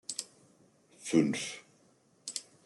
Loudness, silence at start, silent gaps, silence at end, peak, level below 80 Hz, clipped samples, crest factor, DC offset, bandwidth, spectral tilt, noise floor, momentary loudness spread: -34 LUFS; 0.1 s; none; 0.25 s; -12 dBFS; -78 dBFS; under 0.1%; 24 dB; under 0.1%; 12 kHz; -4 dB/octave; -67 dBFS; 19 LU